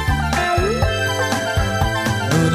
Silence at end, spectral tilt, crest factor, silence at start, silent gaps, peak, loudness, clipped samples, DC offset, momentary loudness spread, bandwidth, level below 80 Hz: 0 s; -5 dB/octave; 16 dB; 0 s; none; -2 dBFS; -19 LUFS; under 0.1%; under 0.1%; 2 LU; 16 kHz; -28 dBFS